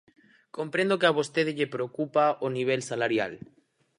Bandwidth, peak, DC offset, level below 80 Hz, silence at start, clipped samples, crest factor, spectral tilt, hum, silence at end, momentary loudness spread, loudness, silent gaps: 11.5 kHz; -8 dBFS; under 0.1%; -74 dBFS; 0.55 s; under 0.1%; 22 dB; -5 dB/octave; none; 0.6 s; 11 LU; -27 LUFS; none